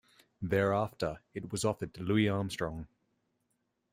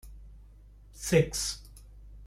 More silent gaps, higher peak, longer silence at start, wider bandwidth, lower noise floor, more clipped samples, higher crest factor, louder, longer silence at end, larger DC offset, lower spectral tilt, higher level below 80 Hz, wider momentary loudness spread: neither; second, -14 dBFS vs -10 dBFS; first, 0.4 s vs 0.05 s; about the same, 16 kHz vs 16 kHz; first, -80 dBFS vs -53 dBFS; neither; about the same, 20 dB vs 22 dB; second, -33 LUFS vs -29 LUFS; first, 1.05 s vs 0 s; neither; first, -6 dB/octave vs -4.5 dB/octave; second, -60 dBFS vs -48 dBFS; second, 14 LU vs 18 LU